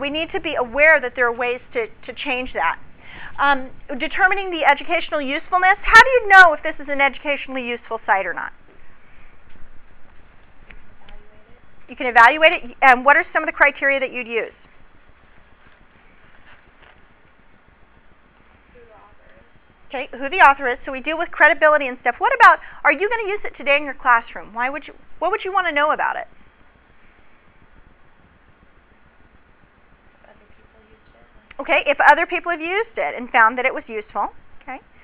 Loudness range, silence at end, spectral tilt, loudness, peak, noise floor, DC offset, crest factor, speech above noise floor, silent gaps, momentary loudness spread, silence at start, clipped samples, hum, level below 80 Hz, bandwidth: 13 LU; 0.25 s; -6 dB/octave; -16 LUFS; 0 dBFS; -52 dBFS; under 0.1%; 20 dB; 34 dB; none; 17 LU; 0 s; 0.1%; none; -48 dBFS; 4 kHz